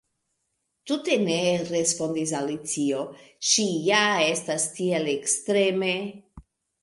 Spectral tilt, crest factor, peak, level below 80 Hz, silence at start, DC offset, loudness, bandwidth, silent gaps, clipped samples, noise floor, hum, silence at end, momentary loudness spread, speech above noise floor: -3 dB/octave; 20 dB; -6 dBFS; -64 dBFS; 0.85 s; under 0.1%; -24 LUFS; 11.5 kHz; none; under 0.1%; -77 dBFS; none; 0.4 s; 8 LU; 52 dB